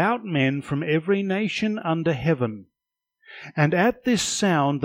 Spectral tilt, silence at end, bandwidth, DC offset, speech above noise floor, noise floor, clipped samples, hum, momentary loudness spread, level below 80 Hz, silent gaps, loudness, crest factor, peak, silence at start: -5 dB/octave; 0 s; 16 kHz; under 0.1%; 63 dB; -85 dBFS; under 0.1%; none; 6 LU; -58 dBFS; none; -23 LUFS; 18 dB; -6 dBFS; 0 s